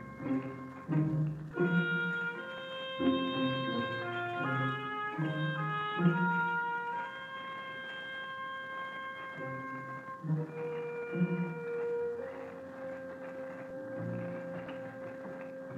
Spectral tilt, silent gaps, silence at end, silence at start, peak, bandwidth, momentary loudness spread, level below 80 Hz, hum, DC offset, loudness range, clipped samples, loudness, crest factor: -8 dB/octave; none; 0 s; 0 s; -16 dBFS; 7.6 kHz; 13 LU; -72 dBFS; none; under 0.1%; 7 LU; under 0.1%; -36 LUFS; 20 dB